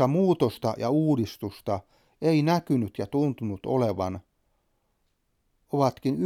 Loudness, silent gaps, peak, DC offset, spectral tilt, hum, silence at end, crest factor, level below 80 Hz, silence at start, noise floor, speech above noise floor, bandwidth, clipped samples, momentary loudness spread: -27 LUFS; none; -8 dBFS; under 0.1%; -8 dB/octave; none; 0 s; 18 dB; -62 dBFS; 0 s; -73 dBFS; 47 dB; 16 kHz; under 0.1%; 10 LU